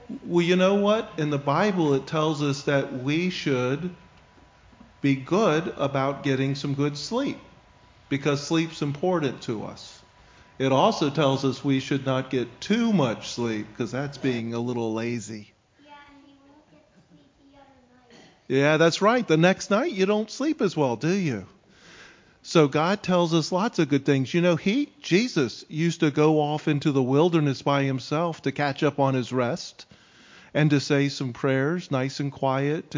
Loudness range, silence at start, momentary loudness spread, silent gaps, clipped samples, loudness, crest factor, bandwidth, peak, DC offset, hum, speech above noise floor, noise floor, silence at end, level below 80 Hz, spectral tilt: 6 LU; 0 s; 9 LU; none; under 0.1%; -24 LUFS; 20 dB; 7.6 kHz; -6 dBFS; under 0.1%; none; 33 dB; -57 dBFS; 0 s; -62 dBFS; -6 dB/octave